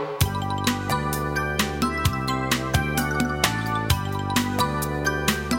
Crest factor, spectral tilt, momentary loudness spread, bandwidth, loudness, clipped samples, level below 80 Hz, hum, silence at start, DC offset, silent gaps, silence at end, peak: 20 dB; -4.5 dB/octave; 2 LU; 16.5 kHz; -24 LUFS; under 0.1%; -36 dBFS; none; 0 s; under 0.1%; none; 0 s; -4 dBFS